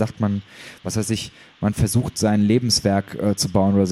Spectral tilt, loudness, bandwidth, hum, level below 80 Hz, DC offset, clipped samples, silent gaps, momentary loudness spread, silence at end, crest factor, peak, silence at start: -5.5 dB/octave; -21 LUFS; 15.5 kHz; none; -42 dBFS; under 0.1%; under 0.1%; none; 11 LU; 0 s; 16 dB; -4 dBFS; 0 s